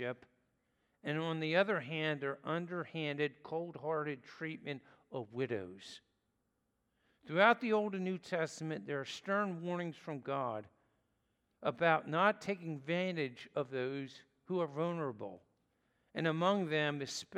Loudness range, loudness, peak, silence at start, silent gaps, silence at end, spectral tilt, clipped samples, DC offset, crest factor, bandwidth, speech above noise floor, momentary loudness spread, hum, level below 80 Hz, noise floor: 6 LU; -37 LUFS; -14 dBFS; 0 s; none; 0 s; -5.5 dB/octave; under 0.1%; under 0.1%; 24 dB; 12.5 kHz; 45 dB; 14 LU; none; -86 dBFS; -82 dBFS